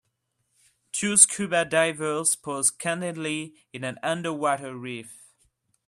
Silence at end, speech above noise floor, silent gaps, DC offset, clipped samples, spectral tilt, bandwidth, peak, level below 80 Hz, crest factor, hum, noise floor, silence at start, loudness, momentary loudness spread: 0.7 s; 50 dB; none; under 0.1%; under 0.1%; -2.5 dB/octave; 14 kHz; -2 dBFS; -72 dBFS; 26 dB; none; -76 dBFS; 0.95 s; -23 LUFS; 18 LU